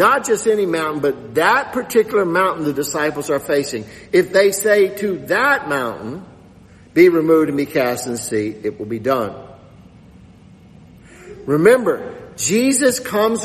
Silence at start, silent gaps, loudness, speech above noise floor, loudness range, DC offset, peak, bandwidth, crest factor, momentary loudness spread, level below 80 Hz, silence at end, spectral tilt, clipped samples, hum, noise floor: 0 s; none; -17 LUFS; 28 dB; 6 LU; under 0.1%; 0 dBFS; 13.5 kHz; 18 dB; 12 LU; -54 dBFS; 0 s; -4 dB/octave; under 0.1%; none; -44 dBFS